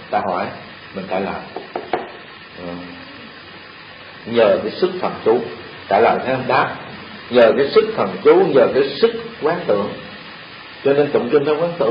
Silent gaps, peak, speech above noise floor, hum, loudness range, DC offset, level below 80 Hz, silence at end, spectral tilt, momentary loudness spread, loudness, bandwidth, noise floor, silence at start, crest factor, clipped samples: none; 0 dBFS; 21 dB; none; 12 LU; under 0.1%; -54 dBFS; 0 s; -9 dB/octave; 21 LU; -17 LUFS; 5.2 kHz; -38 dBFS; 0 s; 18 dB; under 0.1%